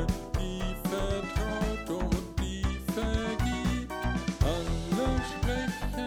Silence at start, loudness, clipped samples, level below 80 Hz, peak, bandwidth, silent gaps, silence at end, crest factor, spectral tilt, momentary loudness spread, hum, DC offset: 0 s; -32 LUFS; under 0.1%; -34 dBFS; -12 dBFS; over 20 kHz; none; 0 s; 18 dB; -5.5 dB/octave; 4 LU; none; under 0.1%